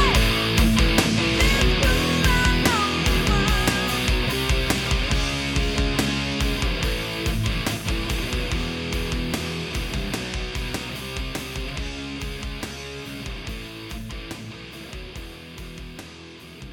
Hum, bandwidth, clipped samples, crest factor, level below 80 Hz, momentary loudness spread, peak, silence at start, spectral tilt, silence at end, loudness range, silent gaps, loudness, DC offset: none; 18 kHz; under 0.1%; 18 dB; -28 dBFS; 18 LU; -6 dBFS; 0 s; -4 dB/octave; 0 s; 15 LU; none; -23 LUFS; under 0.1%